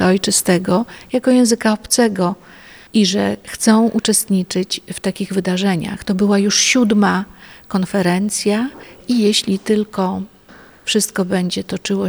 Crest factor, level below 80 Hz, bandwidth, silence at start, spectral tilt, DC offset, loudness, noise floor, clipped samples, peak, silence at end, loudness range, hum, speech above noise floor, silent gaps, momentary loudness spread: 16 dB; -50 dBFS; over 20 kHz; 0 s; -4 dB/octave; under 0.1%; -16 LUFS; -44 dBFS; under 0.1%; -2 dBFS; 0 s; 3 LU; none; 27 dB; none; 9 LU